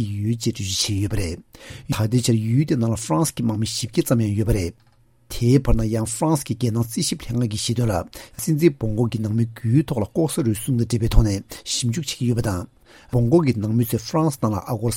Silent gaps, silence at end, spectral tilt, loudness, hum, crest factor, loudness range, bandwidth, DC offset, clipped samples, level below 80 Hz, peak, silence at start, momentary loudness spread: none; 0 s; -6 dB/octave; -22 LUFS; none; 20 dB; 1 LU; 16.5 kHz; under 0.1%; under 0.1%; -32 dBFS; 0 dBFS; 0 s; 8 LU